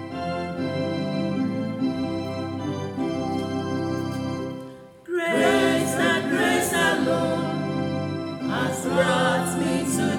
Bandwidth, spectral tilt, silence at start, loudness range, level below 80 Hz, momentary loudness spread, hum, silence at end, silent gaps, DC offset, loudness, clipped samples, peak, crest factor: 17 kHz; -5 dB/octave; 0 s; 6 LU; -60 dBFS; 9 LU; none; 0 s; none; under 0.1%; -24 LUFS; under 0.1%; -8 dBFS; 16 dB